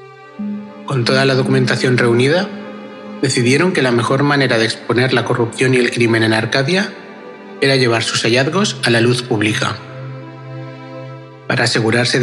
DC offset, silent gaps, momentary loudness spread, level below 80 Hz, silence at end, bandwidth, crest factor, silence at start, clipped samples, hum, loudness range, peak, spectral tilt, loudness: under 0.1%; none; 18 LU; -64 dBFS; 0 s; 12 kHz; 16 dB; 0 s; under 0.1%; none; 3 LU; 0 dBFS; -5 dB/octave; -14 LUFS